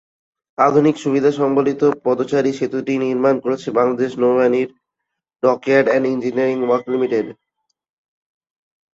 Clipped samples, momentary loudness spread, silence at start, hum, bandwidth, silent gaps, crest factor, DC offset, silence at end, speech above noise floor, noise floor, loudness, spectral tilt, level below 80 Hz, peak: under 0.1%; 6 LU; 0.6 s; none; 7.8 kHz; none; 16 dB; under 0.1%; 1.65 s; 63 dB; -80 dBFS; -17 LUFS; -7 dB/octave; -64 dBFS; -2 dBFS